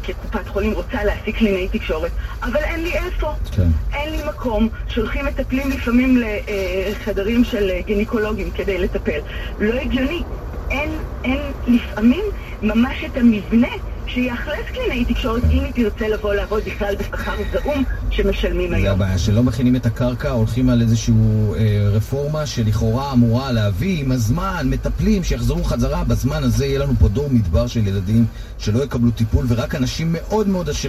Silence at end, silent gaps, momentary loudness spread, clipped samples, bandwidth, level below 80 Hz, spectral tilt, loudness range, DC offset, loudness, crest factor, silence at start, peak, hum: 0 s; none; 7 LU; under 0.1%; 14.5 kHz; -26 dBFS; -7 dB/octave; 4 LU; under 0.1%; -20 LUFS; 16 dB; 0 s; -2 dBFS; none